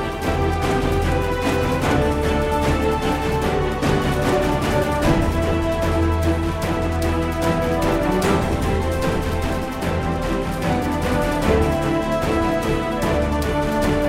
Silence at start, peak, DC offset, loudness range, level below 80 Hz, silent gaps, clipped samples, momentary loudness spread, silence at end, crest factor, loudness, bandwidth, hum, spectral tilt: 0 s; -4 dBFS; under 0.1%; 1 LU; -28 dBFS; none; under 0.1%; 4 LU; 0 s; 16 dB; -20 LUFS; 16 kHz; none; -6 dB/octave